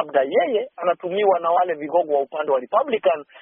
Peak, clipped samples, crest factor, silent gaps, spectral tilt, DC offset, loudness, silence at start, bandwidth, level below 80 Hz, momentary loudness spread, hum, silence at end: -4 dBFS; under 0.1%; 16 dB; none; 0.5 dB/octave; under 0.1%; -21 LUFS; 0 s; 3.7 kHz; -76 dBFS; 4 LU; none; 0.05 s